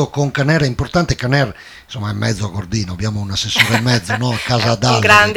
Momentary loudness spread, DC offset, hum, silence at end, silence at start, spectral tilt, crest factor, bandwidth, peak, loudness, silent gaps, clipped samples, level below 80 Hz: 9 LU; under 0.1%; none; 0 s; 0 s; -4.5 dB/octave; 16 dB; 18 kHz; 0 dBFS; -16 LUFS; none; under 0.1%; -38 dBFS